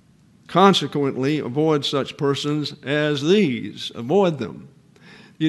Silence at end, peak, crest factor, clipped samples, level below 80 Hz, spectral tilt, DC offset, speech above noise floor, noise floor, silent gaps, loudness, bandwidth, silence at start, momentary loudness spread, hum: 0 s; 0 dBFS; 20 dB; under 0.1%; -66 dBFS; -6 dB/octave; under 0.1%; 31 dB; -51 dBFS; none; -20 LUFS; 12 kHz; 0.5 s; 11 LU; none